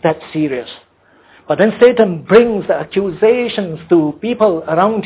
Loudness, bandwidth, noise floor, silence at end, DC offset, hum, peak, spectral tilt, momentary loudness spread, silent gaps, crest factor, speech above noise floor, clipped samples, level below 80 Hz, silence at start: -14 LUFS; 4 kHz; -48 dBFS; 0 s; under 0.1%; none; 0 dBFS; -10.5 dB/octave; 10 LU; none; 14 dB; 35 dB; under 0.1%; -52 dBFS; 0.05 s